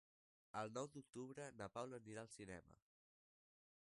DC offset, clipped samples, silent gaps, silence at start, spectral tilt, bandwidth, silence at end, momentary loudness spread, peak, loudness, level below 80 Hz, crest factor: under 0.1%; under 0.1%; none; 0.55 s; -5 dB/octave; 11.5 kHz; 1.05 s; 7 LU; -34 dBFS; -54 LUFS; -82 dBFS; 22 dB